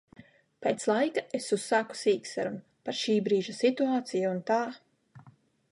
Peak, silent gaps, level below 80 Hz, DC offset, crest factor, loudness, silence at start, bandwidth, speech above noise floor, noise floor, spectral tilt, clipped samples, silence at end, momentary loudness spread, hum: -14 dBFS; none; -80 dBFS; under 0.1%; 18 dB; -30 LUFS; 0.6 s; 11.5 kHz; 31 dB; -60 dBFS; -4.5 dB/octave; under 0.1%; 0.4 s; 8 LU; none